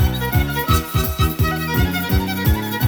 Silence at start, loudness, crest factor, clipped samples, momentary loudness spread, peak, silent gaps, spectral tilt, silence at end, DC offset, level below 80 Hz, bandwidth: 0 s; -19 LUFS; 16 dB; under 0.1%; 2 LU; -2 dBFS; none; -5.5 dB/octave; 0 s; under 0.1%; -24 dBFS; over 20 kHz